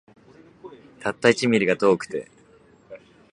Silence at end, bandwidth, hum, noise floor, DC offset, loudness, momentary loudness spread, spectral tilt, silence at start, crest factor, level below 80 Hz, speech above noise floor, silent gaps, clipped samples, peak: 0.35 s; 11 kHz; none; -54 dBFS; under 0.1%; -22 LUFS; 13 LU; -5 dB/octave; 0.65 s; 24 dB; -64 dBFS; 34 dB; none; under 0.1%; -2 dBFS